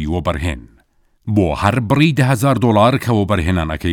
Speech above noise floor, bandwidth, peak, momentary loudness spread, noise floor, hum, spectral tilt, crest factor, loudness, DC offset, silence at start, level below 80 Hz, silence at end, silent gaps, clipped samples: 41 dB; 17.5 kHz; 0 dBFS; 9 LU; -56 dBFS; none; -6.5 dB/octave; 16 dB; -16 LUFS; under 0.1%; 0 s; -34 dBFS; 0 s; none; under 0.1%